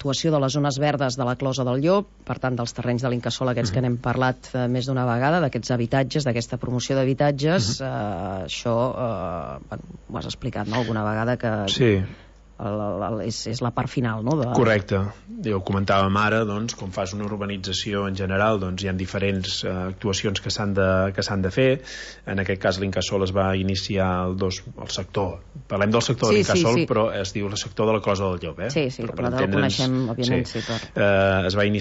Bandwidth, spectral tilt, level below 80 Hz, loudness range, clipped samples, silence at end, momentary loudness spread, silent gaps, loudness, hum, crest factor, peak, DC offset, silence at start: 8 kHz; -5.5 dB/octave; -48 dBFS; 3 LU; under 0.1%; 0 s; 9 LU; none; -23 LUFS; none; 16 dB; -8 dBFS; under 0.1%; 0 s